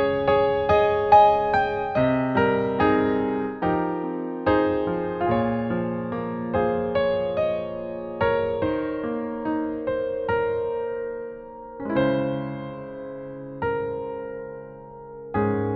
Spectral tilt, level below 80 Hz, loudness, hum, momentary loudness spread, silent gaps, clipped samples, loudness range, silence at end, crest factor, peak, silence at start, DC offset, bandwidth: -8.5 dB/octave; -48 dBFS; -24 LUFS; none; 15 LU; none; under 0.1%; 8 LU; 0 s; 20 dB; -4 dBFS; 0 s; under 0.1%; 6.2 kHz